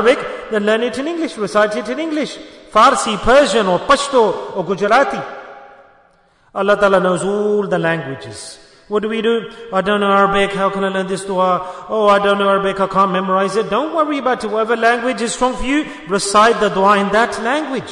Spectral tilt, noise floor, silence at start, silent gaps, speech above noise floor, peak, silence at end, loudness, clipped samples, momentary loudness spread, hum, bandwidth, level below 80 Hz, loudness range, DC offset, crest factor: -4.5 dB/octave; -53 dBFS; 0 s; none; 38 dB; 0 dBFS; 0 s; -15 LUFS; under 0.1%; 10 LU; none; 11 kHz; -42 dBFS; 3 LU; under 0.1%; 16 dB